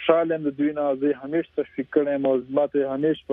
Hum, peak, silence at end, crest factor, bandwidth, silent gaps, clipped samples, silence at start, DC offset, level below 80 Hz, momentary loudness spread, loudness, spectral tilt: none; -4 dBFS; 0 s; 18 dB; 3.8 kHz; none; under 0.1%; 0 s; under 0.1%; -64 dBFS; 5 LU; -24 LUFS; -9.5 dB/octave